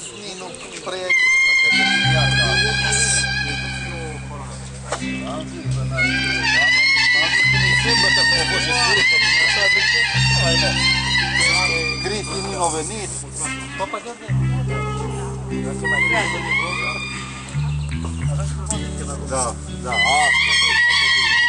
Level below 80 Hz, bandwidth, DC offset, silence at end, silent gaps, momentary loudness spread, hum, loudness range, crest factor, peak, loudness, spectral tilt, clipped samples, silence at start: -36 dBFS; 11 kHz; under 0.1%; 0 s; none; 14 LU; none; 9 LU; 14 dB; -4 dBFS; -17 LUFS; -2.5 dB/octave; under 0.1%; 0 s